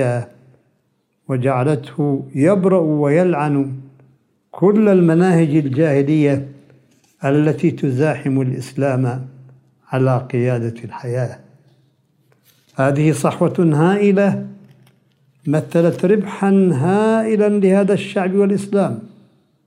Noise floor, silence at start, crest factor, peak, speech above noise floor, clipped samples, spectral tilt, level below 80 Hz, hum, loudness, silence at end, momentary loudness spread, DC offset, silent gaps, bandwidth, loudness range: -65 dBFS; 0 s; 14 dB; -2 dBFS; 50 dB; under 0.1%; -8 dB/octave; -66 dBFS; none; -16 LUFS; 0.6 s; 11 LU; under 0.1%; none; 12 kHz; 6 LU